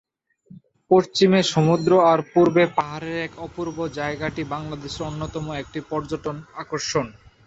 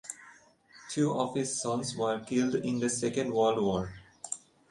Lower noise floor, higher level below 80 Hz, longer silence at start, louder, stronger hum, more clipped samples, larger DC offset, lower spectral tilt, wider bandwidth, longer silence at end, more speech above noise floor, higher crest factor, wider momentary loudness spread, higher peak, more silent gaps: second, -51 dBFS vs -58 dBFS; first, -52 dBFS vs -62 dBFS; first, 0.5 s vs 0.05 s; first, -22 LUFS vs -31 LUFS; neither; neither; neither; about the same, -5.5 dB/octave vs -4.5 dB/octave; second, 8 kHz vs 11.5 kHz; about the same, 0.35 s vs 0.3 s; about the same, 30 dB vs 28 dB; about the same, 18 dB vs 18 dB; about the same, 14 LU vs 13 LU; first, -4 dBFS vs -14 dBFS; neither